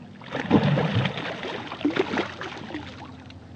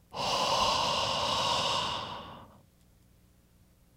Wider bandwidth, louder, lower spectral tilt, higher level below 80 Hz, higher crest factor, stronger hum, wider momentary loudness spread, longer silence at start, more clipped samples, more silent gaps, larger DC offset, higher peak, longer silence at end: second, 8.6 kHz vs 16 kHz; first, -26 LUFS vs -29 LUFS; first, -7 dB/octave vs -2 dB/octave; about the same, -60 dBFS vs -56 dBFS; first, 22 dB vs 16 dB; neither; first, 18 LU vs 13 LU; about the same, 0 s vs 0.1 s; neither; neither; neither; first, -6 dBFS vs -16 dBFS; second, 0 s vs 1.45 s